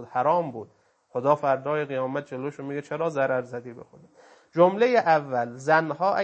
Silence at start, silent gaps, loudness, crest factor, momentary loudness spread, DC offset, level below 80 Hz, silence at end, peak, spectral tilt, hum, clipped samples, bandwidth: 0 s; none; -25 LUFS; 20 dB; 14 LU; under 0.1%; -76 dBFS; 0 s; -4 dBFS; -6.5 dB/octave; none; under 0.1%; 8.6 kHz